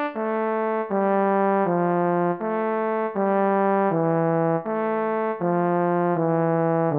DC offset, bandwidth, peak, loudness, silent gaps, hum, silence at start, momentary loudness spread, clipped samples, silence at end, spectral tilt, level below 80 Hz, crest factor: under 0.1%; 4 kHz; -10 dBFS; -23 LUFS; none; none; 0 s; 4 LU; under 0.1%; 0 s; -12 dB/octave; -74 dBFS; 12 dB